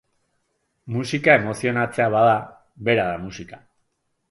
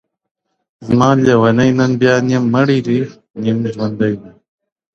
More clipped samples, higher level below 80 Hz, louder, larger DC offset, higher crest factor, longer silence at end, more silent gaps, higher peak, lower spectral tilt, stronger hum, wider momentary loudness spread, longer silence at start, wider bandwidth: neither; second, -56 dBFS vs -50 dBFS; second, -20 LUFS vs -14 LUFS; neither; first, 22 dB vs 14 dB; about the same, 0.75 s vs 0.65 s; second, none vs 3.30-3.34 s; about the same, 0 dBFS vs 0 dBFS; about the same, -6 dB/octave vs -7 dB/octave; neither; first, 16 LU vs 10 LU; about the same, 0.85 s vs 0.8 s; first, 11.5 kHz vs 7.4 kHz